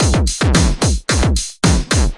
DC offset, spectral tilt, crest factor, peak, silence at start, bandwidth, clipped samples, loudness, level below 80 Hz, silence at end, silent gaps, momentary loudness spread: under 0.1%; -4.5 dB/octave; 14 dB; 0 dBFS; 0 s; 11.5 kHz; under 0.1%; -15 LUFS; -18 dBFS; 0 s; none; 3 LU